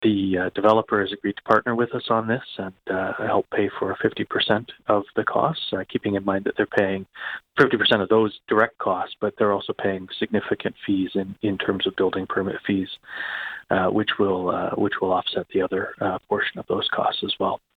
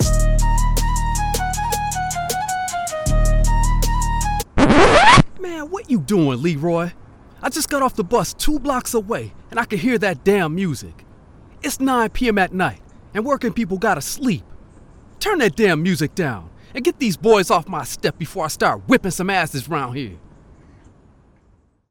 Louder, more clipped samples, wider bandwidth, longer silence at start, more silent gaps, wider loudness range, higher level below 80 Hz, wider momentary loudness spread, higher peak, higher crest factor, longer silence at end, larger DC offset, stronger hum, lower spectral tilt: second, -23 LUFS vs -19 LUFS; neither; second, 6.6 kHz vs 19 kHz; about the same, 0 s vs 0 s; neither; second, 3 LU vs 6 LU; second, -60 dBFS vs -26 dBFS; second, 8 LU vs 11 LU; second, -4 dBFS vs 0 dBFS; about the same, 18 dB vs 18 dB; second, 0.2 s vs 1.75 s; neither; neither; first, -7 dB/octave vs -4.5 dB/octave